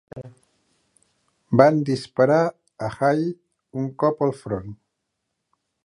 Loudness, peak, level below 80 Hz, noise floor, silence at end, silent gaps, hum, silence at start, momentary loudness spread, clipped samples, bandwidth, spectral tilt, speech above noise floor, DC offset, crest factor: -22 LUFS; 0 dBFS; -58 dBFS; -78 dBFS; 1.1 s; none; none; 0.15 s; 21 LU; under 0.1%; 11 kHz; -7.5 dB/octave; 58 dB; under 0.1%; 22 dB